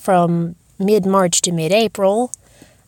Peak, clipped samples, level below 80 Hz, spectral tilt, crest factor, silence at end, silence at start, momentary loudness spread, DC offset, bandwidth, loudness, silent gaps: -2 dBFS; under 0.1%; -56 dBFS; -4.5 dB/octave; 16 dB; 0.6 s; 0 s; 10 LU; under 0.1%; 17 kHz; -16 LUFS; none